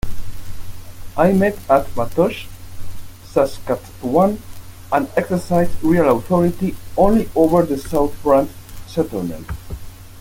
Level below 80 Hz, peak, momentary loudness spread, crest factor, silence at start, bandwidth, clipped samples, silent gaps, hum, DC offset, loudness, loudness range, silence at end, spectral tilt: -34 dBFS; -2 dBFS; 22 LU; 16 dB; 0.05 s; 17 kHz; under 0.1%; none; none; under 0.1%; -18 LUFS; 4 LU; 0 s; -7 dB/octave